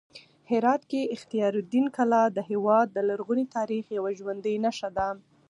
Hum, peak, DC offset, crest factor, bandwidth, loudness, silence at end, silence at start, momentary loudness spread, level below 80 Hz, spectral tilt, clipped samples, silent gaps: none; -10 dBFS; under 0.1%; 16 dB; 11 kHz; -27 LUFS; 0.3 s; 0.15 s; 8 LU; -64 dBFS; -6 dB/octave; under 0.1%; none